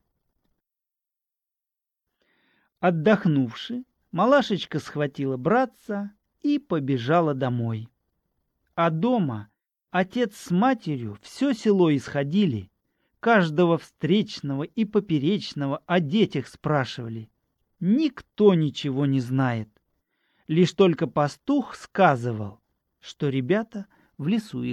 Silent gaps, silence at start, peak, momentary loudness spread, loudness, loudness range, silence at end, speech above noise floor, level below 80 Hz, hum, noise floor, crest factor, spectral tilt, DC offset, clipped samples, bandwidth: none; 2.8 s; -4 dBFS; 12 LU; -24 LUFS; 3 LU; 0 s; 65 dB; -66 dBFS; none; -88 dBFS; 20 dB; -7 dB/octave; under 0.1%; under 0.1%; 12.5 kHz